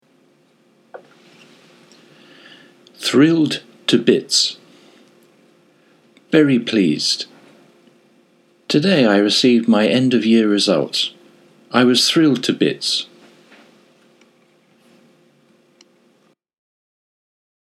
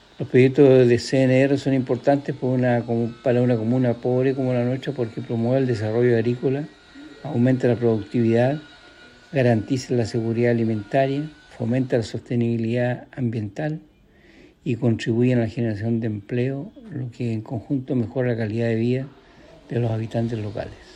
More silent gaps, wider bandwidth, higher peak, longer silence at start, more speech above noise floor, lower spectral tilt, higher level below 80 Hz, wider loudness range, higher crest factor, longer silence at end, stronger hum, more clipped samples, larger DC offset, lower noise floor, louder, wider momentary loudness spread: neither; first, 14.5 kHz vs 10.5 kHz; about the same, 0 dBFS vs -2 dBFS; first, 0.95 s vs 0.2 s; first, 45 dB vs 31 dB; second, -4 dB/octave vs -8 dB/octave; second, -74 dBFS vs -58 dBFS; about the same, 6 LU vs 5 LU; about the same, 20 dB vs 18 dB; first, 4.75 s vs 0.05 s; neither; neither; neither; first, -59 dBFS vs -52 dBFS; first, -16 LUFS vs -22 LUFS; about the same, 8 LU vs 10 LU